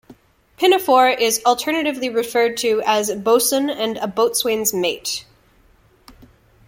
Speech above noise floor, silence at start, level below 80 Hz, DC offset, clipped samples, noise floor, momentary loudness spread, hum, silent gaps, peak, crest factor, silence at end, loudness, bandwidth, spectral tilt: 36 dB; 0.6 s; -58 dBFS; under 0.1%; under 0.1%; -54 dBFS; 8 LU; none; none; -2 dBFS; 18 dB; 1.45 s; -18 LUFS; 17 kHz; -2 dB/octave